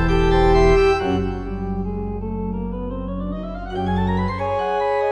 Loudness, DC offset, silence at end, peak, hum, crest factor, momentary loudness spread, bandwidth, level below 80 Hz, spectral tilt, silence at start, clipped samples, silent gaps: -21 LUFS; under 0.1%; 0 s; -2 dBFS; none; 18 dB; 12 LU; 8.4 kHz; -26 dBFS; -7.5 dB/octave; 0 s; under 0.1%; none